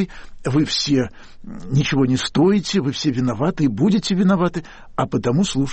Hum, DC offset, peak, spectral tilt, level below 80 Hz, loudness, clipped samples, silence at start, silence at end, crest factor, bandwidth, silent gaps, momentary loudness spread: none; under 0.1%; -8 dBFS; -6 dB/octave; -42 dBFS; -19 LUFS; under 0.1%; 0 s; 0 s; 12 dB; 8.6 kHz; none; 11 LU